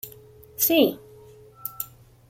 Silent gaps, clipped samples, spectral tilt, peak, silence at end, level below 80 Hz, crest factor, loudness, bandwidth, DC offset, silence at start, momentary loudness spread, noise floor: none; under 0.1%; -3 dB/octave; -6 dBFS; 0.45 s; -62 dBFS; 22 dB; -23 LUFS; 16.5 kHz; under 0.1%; 0.05 s; 23 LU; -49 dBFS